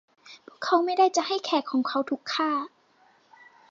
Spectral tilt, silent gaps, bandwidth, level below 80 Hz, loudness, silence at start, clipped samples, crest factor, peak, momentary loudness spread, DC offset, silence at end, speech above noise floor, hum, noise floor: -2 dB/octave; none; 7.6 kHz; -86 dBFS; -26 LUFS; 0.25 s; under 0.1%; 18 dB; -10 dBFS; 8 LU; under 0.1%; 1.05 s; 37 dB; none; -62 dBFS